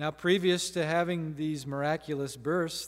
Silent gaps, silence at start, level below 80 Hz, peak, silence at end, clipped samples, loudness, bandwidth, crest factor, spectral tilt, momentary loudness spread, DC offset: none; 0 s; -64 dBFS; -14 dBFS; 0 s; under 0.1%; -30 LUFS; 16 kHz; 18 dB; -4.5 dB/octave; 8 LU; under 0.1%